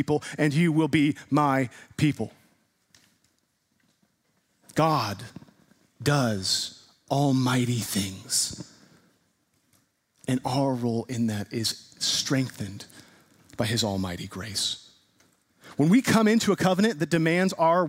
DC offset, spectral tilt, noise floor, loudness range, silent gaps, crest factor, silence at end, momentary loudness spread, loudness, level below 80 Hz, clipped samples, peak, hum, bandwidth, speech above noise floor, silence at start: under 0.1%; -4.5 dB/octave; -72 dBFS; 7 LU; none; 20 dB; 0 s; 14 LU; -25 LUFS; -62 dBFS; under 0.1%; -8 dBFS; none; 16 kHz; 47 dB; 0 s